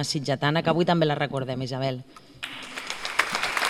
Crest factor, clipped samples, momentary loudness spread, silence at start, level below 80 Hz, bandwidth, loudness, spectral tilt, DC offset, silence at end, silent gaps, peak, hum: 24 dB; under 0.1%; 13 LU; 0 s; -58 dBFS; 16.5 kHz; -26 LUFS; -4.5 dB/octave; under 0.1%; 0 s; none; -4 dBFS; none